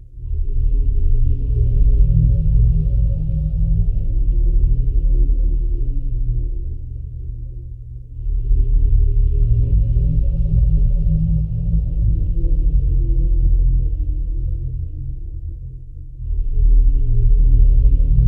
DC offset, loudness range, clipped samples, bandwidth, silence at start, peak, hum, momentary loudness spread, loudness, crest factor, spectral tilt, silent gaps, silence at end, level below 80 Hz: under 0.1%; 6 LU; under 0.1%; 0.7 kHz; 0.1 s; -2 dBFS; none; 14 LU; -20 LUFS; 12 dB; -13 dB/octave; none; 0 s; -16 dBFS